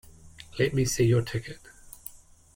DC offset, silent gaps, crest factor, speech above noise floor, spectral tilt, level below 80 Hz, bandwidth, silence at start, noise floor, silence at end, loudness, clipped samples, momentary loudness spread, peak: under 0.1%; none; 16 dB; 24 dB; -5.5 dB/octave; -50 dBFS; 16.5 kHz; 0.25 s; -49 dBFS; 0.4 s; -26 LUFS; under 0.1%; 21 LU; -12 dBFS